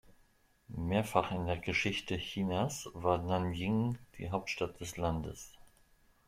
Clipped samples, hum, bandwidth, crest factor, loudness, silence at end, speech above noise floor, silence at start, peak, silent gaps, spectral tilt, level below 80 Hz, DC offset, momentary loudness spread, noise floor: under 0.1%; none; 16 kHz; 24 dB; -35 LUFS; 0.65 s; 33 dB; 0.1 s; -12 dBFS; none; -5.5 dB/octave; -56 dBFS; under 0.1%; 9 LU; -68 dBFS